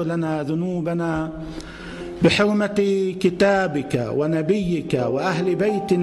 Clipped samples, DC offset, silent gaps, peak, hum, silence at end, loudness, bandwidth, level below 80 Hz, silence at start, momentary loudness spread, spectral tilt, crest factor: under 0.1%; under 0.1%; none; -6 dBFS; none; 0 s; -21 LUFS; 12 kHz; -46 dBFS; 0 s; 13 LU; -6.5 dB/octave; 14 dB